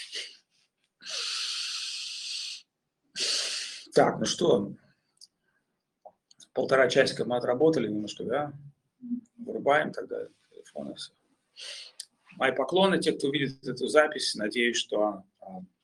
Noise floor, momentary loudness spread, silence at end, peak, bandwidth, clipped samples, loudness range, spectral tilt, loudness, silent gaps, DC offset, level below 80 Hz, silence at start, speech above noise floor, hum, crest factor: -79 dBFS; 19 LU; 0.2 s; -6 dBFS; 12.5 kHz; under 0.1%; 6 LU; -3.5 dB/octave; -28 LUFS; none; under 0.1%; -72 dBFS; 0 s; 51 dB; none; 24 dB